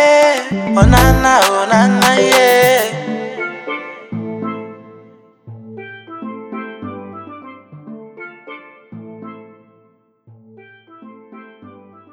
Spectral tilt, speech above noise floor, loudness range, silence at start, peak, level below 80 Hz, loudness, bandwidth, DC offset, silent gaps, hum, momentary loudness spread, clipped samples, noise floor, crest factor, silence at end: -4.5 dB/octave; 45 dB; 25 LU; 0 s; 0 dBFS; -28 dBFS; -12 LUFS; over 20 kHz; under 0.1%; none; none; 25 LU; under 0.1%; -55 dBFS; 16 dB; 0.45 s